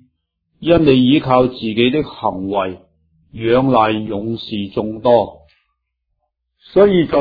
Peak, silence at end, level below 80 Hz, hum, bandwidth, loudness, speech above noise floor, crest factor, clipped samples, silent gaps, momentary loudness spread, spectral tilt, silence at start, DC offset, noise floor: 0 dBFS; 0 s; -44 dBFS; none; 5 kHz; -16 LUFS; 57 dB; 16 dB; under 0.1%; none; 11 LU; -9.5 dB/octave; 0.6 s; under 0.1%; -72 dBFS